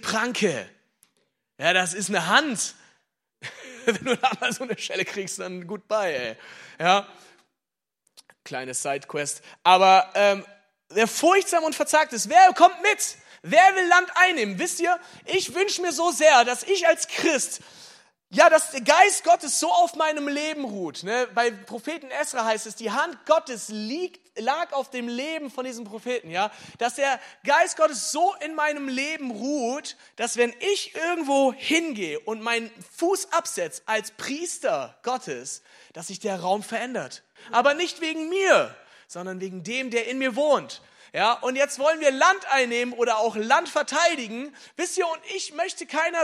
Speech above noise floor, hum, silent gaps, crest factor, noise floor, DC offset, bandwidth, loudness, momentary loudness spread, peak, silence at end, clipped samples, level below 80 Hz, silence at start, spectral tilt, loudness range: 64 dB; none; none; 24 dB; -88 dBFS; under 0.1%; 15 kHz; -23 LUFS; 16 LU; 0 dBFS; 0 s; under 0.1%; -80 dBFS; 0.05 s; -2 dB/octave; 9 LU